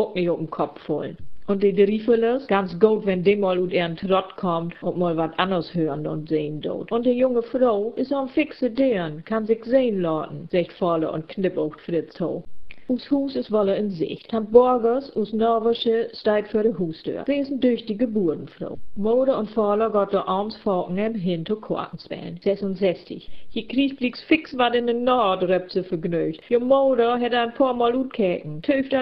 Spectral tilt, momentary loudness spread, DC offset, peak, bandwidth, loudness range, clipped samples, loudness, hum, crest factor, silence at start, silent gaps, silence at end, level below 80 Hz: -9 dB/octave; 9 LU; 0.3%; -2 dBFS; 5.6 kHz; 4 LU; under 0.1%; -23 LUFS; none; 20 dB; 0 s; none; 0 s; -56 dBFS